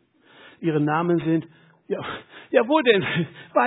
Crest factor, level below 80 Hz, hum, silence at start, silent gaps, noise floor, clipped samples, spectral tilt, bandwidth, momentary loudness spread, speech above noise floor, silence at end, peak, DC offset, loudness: 20 dB; -66 dBFS; none; 0.6 s; none; -51 dBFS; under 0.1%; -9.5 dB/octave; 4 kHz; 13 LU; 30 dB; 0 s; -4 dBFS; under 0.1%; -22 LUFS